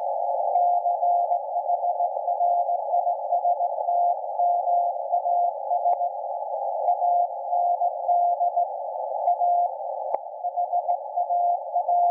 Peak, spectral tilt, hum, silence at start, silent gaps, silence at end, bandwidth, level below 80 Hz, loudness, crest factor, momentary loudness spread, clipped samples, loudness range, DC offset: -10 dBFS; -2.5 dB/octave; none; 0 s; none; 0 s; 1.2 kHz; under -90 dBFS; -24 LUFS; 14 dB; 6 LU; under 0.1%; 1 LU; under 0.1%